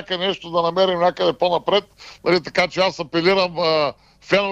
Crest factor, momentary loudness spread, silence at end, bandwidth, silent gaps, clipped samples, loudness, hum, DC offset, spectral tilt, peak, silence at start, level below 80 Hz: 16 dB; 4 LU; 0 s; 9.2 kHz; none; under 0.1%; -19 LUFS; none; under 0.1%; -5 dB/octave; -4 dBFS; 0 s; -56 dBFS